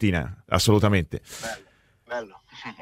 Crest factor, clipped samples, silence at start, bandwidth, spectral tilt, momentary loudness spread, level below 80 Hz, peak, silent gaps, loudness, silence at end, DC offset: 20 dB; under 0.1%; 0 s; 16 kHz; -5 dB/octave; 21 LU; -44 dBFS; -4 dBFS; none; -25 LUFS; 0.1 s; under 0.1%